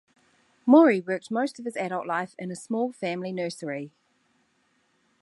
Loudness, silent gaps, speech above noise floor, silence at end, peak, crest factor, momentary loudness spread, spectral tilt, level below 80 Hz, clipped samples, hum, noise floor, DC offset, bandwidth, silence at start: -26 LUFS; none; 44 dB; 1.35 s; -6 dBFS; 22 dB; 17 LU; -6 dB/octave; -82 dBFS; under 0.1%; none; -69 dBFS; under 0.1%; 11.5 kHz; 0.65 s